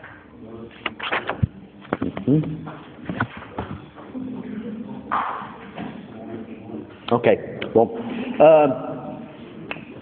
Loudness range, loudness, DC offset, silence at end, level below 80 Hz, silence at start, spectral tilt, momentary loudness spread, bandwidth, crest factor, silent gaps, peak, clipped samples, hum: 11 LU; -22 LUFS; under 0.1%; 0 s; -48 dBFS; 0 s; -11.5 dB/octave; 19 LU; 4.4 kHz; 22 dB; none; -2 dBFS; under 0.1%; none